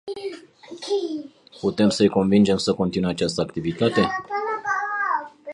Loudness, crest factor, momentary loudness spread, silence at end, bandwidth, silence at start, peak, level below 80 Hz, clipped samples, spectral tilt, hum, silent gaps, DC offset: -22 LUFS; 18 dB; 16 LU; 0 s; 11 kHz; 0.05 s; -4 dBFS; -54 dBFS; under 0.1%; -5.5 dB/octave; none; none; under 0.1%